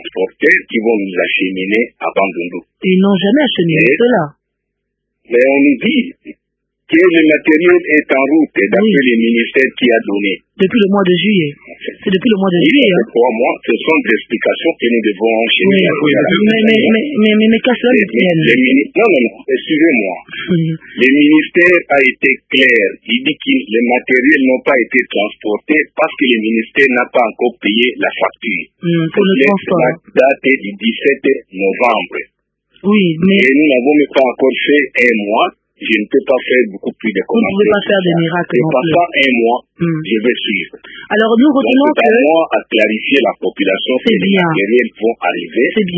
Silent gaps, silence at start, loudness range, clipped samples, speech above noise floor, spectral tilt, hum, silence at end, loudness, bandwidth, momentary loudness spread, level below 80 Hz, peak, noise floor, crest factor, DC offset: none; 0 s; 3 LU; under 0.1%; 61 dB; -7.5 dB/octave; none; 0 s; -12 LUFS; 8 kHz; 8 LU; -56 dBFS; 0 dBFS; -73 dBFS; 12 dB; under 0.1%